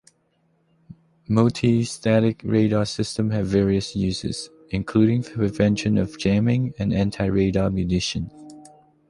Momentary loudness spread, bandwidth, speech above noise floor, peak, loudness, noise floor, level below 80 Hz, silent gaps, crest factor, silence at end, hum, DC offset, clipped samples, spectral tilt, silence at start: 7 LU; 11.5 kHz; 45 dB; -4 dBFS; -22 LUFS; -66 dBFS; -42 dBFS; none; 18 dB; 0.5 s; none; under 0.1%; under 0.1%; -6.5 dB/octave; 0.9 s